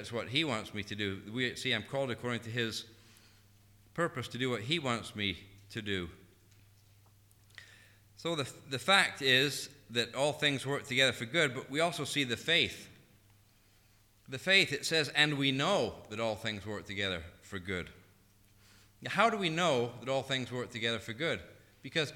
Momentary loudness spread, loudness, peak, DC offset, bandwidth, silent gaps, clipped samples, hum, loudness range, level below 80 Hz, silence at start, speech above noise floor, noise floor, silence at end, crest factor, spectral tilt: 14 LU; -32 LUFS; -10 dBFS; under 0.1%; 19 kHz; none; under 0.1%; none; 8 LU; -66 dBFS; 0 s; 32 dB; -65 dBFS; 0 s; 24 dB; -3.5 dB/octave